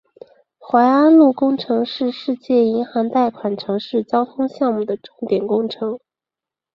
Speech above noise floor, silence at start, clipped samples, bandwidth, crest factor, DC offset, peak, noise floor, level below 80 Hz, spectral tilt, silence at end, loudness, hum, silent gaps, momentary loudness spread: 71 dB; 0.65 s; under 0.1%; 6 kHz; 16 dB; under 0.1%; -2 dBFS; -88 dBFS; -66 dBFS; -8 dB/octave; 0.75 s; -18 LUFS; none; none; 13 LU